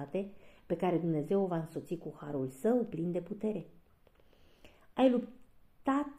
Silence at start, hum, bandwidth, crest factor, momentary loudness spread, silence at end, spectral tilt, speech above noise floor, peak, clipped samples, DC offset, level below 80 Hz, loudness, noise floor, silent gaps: 0 s; none; 15 kHz; 20 dB; 13 LU; 0 s; -8 dB/octave; 30 dB; -14 dBFS; under 0.1%; under 0.1%; -68 dBFS; -34 LUFS; -64 dBFS; none